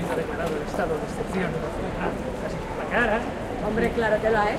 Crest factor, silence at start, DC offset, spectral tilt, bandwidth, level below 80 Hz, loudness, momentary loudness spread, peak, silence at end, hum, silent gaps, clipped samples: 16 dB; 0 s; under 0.1%; -6 dB/octave; 15.5 kHz; -40 dBFS; -26 LUFS; 8 LU; -10 dBFS; 0 s; none; none; under 0.1%